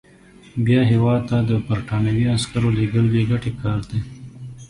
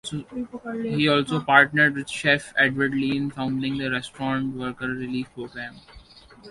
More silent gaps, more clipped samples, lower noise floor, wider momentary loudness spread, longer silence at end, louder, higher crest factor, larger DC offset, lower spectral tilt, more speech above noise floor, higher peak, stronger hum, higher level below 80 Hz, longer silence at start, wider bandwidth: neither; neither; about the same, -47 dBFS vs -48 dBFS; second, 12 LU vs 16 LU; about the same, 0.05 s vs 0 s; first, -20 LUFS vs -23 LUFS; second, 16 dB vs 24 dB; neither; first, -7 dB/octave vs -5 dB/octave; first, 29 dB vs 24 dB; second, -4 dBFS vs 0 dBFS; neither; first, -42 dBFS vs -56 dBFS; first, 0.55 s vs 0.05 s; about the same, 11 kHz vs 11.5 kHz